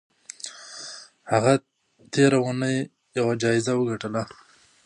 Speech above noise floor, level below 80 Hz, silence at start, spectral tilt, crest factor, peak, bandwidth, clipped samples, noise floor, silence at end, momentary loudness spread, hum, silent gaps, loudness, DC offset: 20 dB; -66 dBFS; 0.45 s; -5.5 dB/octave; 20 dB; -4 dBFS; 11 kHz; under 0.1%; -42 dBFS; 0.6 s; 18 LU; none; none; -24 LUFS; under 0.1%